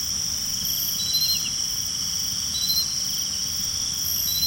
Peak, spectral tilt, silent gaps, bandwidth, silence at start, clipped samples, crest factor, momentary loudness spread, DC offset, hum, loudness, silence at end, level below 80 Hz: -10 dBFS; 0.5 dB/octave; none; 16.5 kHz; 0 s; under 0.1%; 16 dB; 3 LU; under 0.1%; none; -22 LUFS; 0 s; -50 dBFS